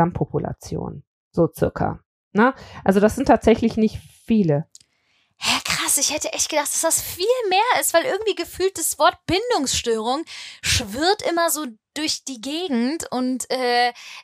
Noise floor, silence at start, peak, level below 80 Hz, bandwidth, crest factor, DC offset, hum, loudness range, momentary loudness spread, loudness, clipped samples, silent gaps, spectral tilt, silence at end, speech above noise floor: -65 dBFS; 0 s; -2 dBFS; -46 dBFS; 15.5 kHz; 20 dB; under 0.1%; none; 3 LU; 9 LU; -21 LUFS; under 0.1%; 1.07-1.31 s, 2.06-2.31 s; -3.5 dB/octave; 0 s; 44 dB